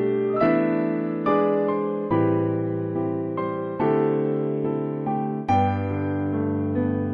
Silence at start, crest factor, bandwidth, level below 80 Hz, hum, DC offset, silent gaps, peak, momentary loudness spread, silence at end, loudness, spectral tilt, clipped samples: 0 s; 14 dB; 6 kHz; -60 dBFS; none; under 0.1%; none; -10 dBFS; 6 LU; 0 s; -24 LUFS; -10 dB/octave; under 0.1%